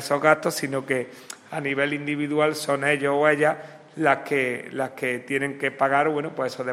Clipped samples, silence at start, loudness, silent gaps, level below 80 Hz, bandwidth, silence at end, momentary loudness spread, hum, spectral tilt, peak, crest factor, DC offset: under 0.1%; 0 s; -24 LUFS; none; -72 dBFS; 16 kHz; 0 s; 10 LU; none; -4.5 dB/octave; -4 dBFS; 20 dB; under 0.1%